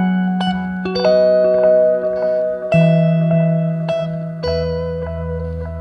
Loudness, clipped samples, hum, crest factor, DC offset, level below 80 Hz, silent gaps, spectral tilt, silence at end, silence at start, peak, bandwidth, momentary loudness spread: -16 LUFS; under 0.1%; none; 14 dB; under 0.1%; -36 dBFS; none; -9 dB/octave; 0 s; 0 s; -2 dBFS; 6 kHz; 11 LU